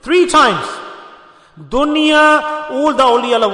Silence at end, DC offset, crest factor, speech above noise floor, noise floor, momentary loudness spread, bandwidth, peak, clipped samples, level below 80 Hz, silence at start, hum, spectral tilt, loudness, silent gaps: 0 s; under 0.1%; 12 dB; 29 dB; -41 dBFS; 13 LU; 11 kHz; -2 dBFS; under 0.1%; -42 dBFS; 0.05 s; none; -3 dB/octave; -12 LUFS; none